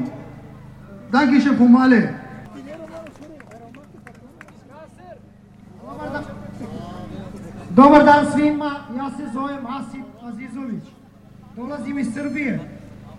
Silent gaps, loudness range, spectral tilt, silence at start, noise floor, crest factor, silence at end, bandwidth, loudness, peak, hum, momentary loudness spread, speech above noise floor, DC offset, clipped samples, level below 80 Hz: none; 20 LU; -6.5 dB/octave; 0 s; -46 dBFS; 20 dB; 0 s; 10.5 kHz; -17 LUFS; 0 dBFS; none; 25 LU; 30 dB; under 0.1%; under 0.1%; -50 dBFS